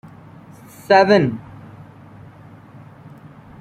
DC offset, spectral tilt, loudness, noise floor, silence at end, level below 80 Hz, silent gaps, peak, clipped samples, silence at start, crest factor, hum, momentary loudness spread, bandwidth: under 0.1%; -6.5 dB/octave; -15 LUFS; -42 dBFS; 0.55 s; -58 dBFS; none; -2 dBFS; under 0.1%; 0.9 s; 20 dB; none; 28 LU; 15.5 kHz